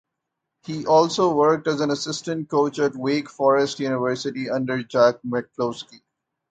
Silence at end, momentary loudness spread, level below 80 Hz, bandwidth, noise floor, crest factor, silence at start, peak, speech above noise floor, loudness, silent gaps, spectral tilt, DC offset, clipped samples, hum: 0.55 s; 10 LU; -64 dBFS; 9.2 kHz; -81 dBFS; 20 dB; 0.65 s; -4 dBFS; 60 dB; -22 LUFS; none; -5 dB/octave; under 0.1%; under 0.1%; none